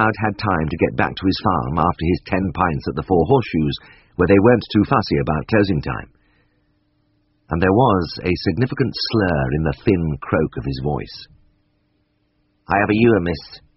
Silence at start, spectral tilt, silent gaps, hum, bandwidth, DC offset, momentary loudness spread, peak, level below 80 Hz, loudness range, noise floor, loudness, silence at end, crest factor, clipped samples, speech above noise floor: 0 s; -5.5 dB/octave; none; none; 6 kHz; under 0.1%; 10 LU; 0 dBFS; -38 dBFS; 4 LU; -65 dBFS; -19 LUFS; 0.2 s; 18 dB; under 0.1%; 47 dB